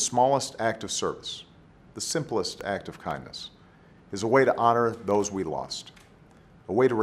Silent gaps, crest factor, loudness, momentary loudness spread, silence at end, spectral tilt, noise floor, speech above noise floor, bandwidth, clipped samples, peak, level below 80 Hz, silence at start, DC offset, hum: none; 22 dB; -27 LUFS; 17 LU; 0 s; -4 dB/octave; -54 dBFS; 28 dB; 14 kHz; under 0.1%; -6 dBFS; -60 dBFS; 0 s; under 0.1%; none